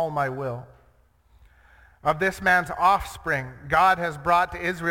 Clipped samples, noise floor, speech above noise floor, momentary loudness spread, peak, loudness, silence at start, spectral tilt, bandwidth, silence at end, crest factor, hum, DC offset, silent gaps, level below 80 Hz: under 0.1%; -60 dBFS; 37 dB; 9 LU; -6 dBFS; -23 LUFS; 0 s; -5 dB/octave; 17.5 kHz; 0 s; 18 dB; none; under 0.1%; none; -48 dBFS